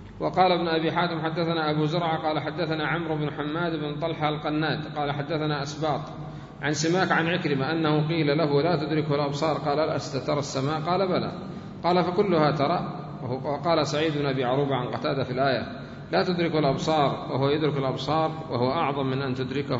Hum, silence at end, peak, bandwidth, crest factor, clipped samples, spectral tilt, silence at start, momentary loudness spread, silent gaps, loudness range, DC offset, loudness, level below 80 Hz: none; 0 s; -8 dBFS; 7.8 kHz; 18 dB; under 0.1%; -6 dB/octave; 0 s; 6 LU; none; 3 LU; under 0.1%; -26 LUFS; -56 dBFS